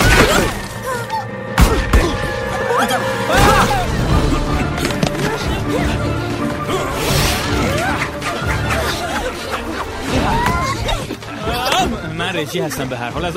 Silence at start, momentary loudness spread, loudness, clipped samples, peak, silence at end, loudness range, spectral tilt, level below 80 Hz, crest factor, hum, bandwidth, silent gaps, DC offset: 0 s; 9 LU; -17 LUFS; under 0.1%; 0 dBFS; 0 s; 3 LU; -4.5 dB/octave; -24 dBFS; 16 dB; none; 16.5 kHz; none; under 0.1%